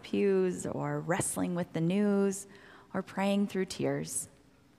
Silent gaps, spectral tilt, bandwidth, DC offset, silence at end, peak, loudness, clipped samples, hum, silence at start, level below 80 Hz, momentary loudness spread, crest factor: none; -5.5 dB/octave; 15.5 kHz; under 0.1%; 0.5 s; -16 dBFS; -32 LUFS; under 0.1%; none; 0.05 s; -68 dBFS; 11 LU; 16 dB